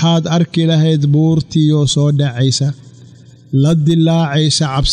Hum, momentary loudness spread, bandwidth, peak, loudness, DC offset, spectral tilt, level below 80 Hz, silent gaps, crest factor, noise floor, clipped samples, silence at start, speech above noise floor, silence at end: none; 3 LU; 10 kHz; -2 dBFS; -13 LUFS; under 0.1%; -6 dB/octave; -34 dBFS; none; 10 dB; -39 dBFS; under 0.1%; 0 s; 27 dB; 0 s